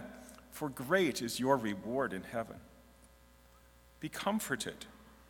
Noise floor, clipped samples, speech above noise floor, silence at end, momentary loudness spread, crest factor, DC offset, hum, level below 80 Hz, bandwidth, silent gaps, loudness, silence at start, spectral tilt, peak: -62 dBFS; under 0.1%; 26 dB; 0.05 s; 19 LU; 24 dB; under 0.1%; none; -64 dBFS; 18 kHz; none; -36 LUFS; 0 s; -4 dB/octave; -14 dBFS